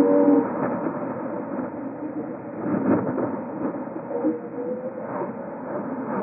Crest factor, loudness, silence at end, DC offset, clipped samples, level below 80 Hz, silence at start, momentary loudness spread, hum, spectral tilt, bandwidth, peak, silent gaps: 18 dB; -26 LUFS; 0 s; under 0.1%; under 0.1%; -66 dBFS; 0 s; 11 LU; none; -5 dB/octave; 2.8 kHz; -6 dBFS; none